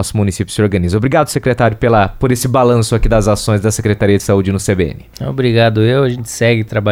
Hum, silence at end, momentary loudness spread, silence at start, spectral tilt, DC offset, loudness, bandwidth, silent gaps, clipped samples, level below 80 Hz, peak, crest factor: none; 0 s; 5 LU; 0 s; -6 dB/octave; under 0.1%; -13 LUFS; 16 kHz; none; under 0.1%; -28 dBFS; 0 dBFS; 12 dB